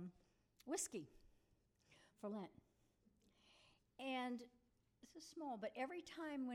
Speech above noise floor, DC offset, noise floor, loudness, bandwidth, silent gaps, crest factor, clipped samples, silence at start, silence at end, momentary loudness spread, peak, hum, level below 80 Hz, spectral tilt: 31 dB; under 0.1%; -80 dBFS; -50 LUFS; 16 kHz; none; 18 dB; under 0.1%; 0 s; 0 s; 17 LU; -34 dBFS; none; -82 dBFS; -3.5 dB/octave